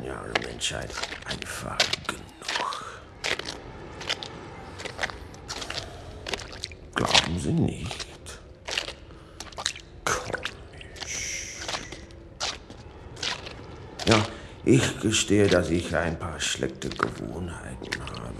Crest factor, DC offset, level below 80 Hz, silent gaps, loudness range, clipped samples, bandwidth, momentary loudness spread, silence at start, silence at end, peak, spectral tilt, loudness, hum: 26 dB; under 0.1%; -48 dBFS; none; 9 LU; under 0.1%; 12 kHz; 19 LU; 0 s; 0 s; -2 dBFS; -3.5 dB/octave; -28 LUFS; none